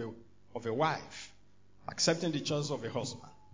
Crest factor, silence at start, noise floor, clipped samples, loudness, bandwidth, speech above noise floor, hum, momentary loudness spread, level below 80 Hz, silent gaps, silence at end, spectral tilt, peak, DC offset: 20 dB; 0 s; -65 dBFS; under 0.1%; -34 LUFS; 7.8 kHz; 31 dB; none; 19 LU; -68 dBFS; none; 0.2 s; -4 dB/octave; -16 dBFS; 0.1%